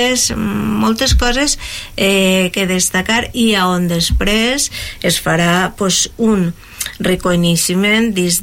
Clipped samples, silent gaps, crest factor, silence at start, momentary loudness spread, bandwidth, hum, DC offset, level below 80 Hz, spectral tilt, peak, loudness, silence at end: under 0.1%; none; 12 dB; 0 s; 6 LU; 17 kHz; none; under 0.1%; -26 dBFS; -3.5 dB/octave; -2 dBFS; -14 LUFS; 0 s